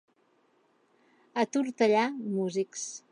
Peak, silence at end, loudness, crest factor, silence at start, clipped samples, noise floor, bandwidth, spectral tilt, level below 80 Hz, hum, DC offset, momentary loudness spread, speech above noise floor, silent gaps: -12 dBFS; 0.15 s; -29 LUFS; 18 dB; 1.35 s; under 0.1%; -69 dBFS; 10.5 kHz; -4.5 dB/octave; -86 dBFS; none; under 0.1%; 11 LU; 40 dB; none